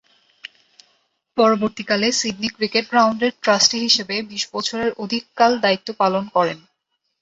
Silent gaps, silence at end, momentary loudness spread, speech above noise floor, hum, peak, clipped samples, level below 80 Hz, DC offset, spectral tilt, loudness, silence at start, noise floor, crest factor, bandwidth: none; 0.65 s; 11 LU; 54 dB; none; -2 dBFS; under 0.1%; -62 dBFS; under 0.1%; -2.5 dB/octave; -19 LUFS; 1.35 s; -74 dBFS; 18 dB; 8.2 kHz